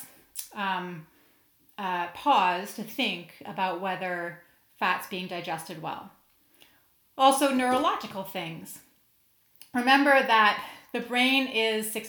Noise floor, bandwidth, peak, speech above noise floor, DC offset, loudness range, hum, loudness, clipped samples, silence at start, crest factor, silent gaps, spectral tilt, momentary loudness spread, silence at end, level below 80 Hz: -66 dBFS; over 20 kHz; -8 dBFS; 39 dB; under 0.1%; 8 LU; none; -26 LUFS; under 0.1%; 0 s; 22 dB; none; -3 dB/octave; 18 LU; 0 s; -74 dBFS